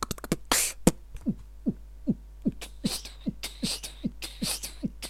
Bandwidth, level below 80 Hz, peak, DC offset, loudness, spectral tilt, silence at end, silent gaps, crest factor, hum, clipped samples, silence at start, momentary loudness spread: 16.5 kHz; -44 dBFS; -4 dBFS; under 0.1%; -31 LUFS; -3.5 dB/octave; 0 s; none; 28 dB; none; under 0.1%; 0 s; 11 LU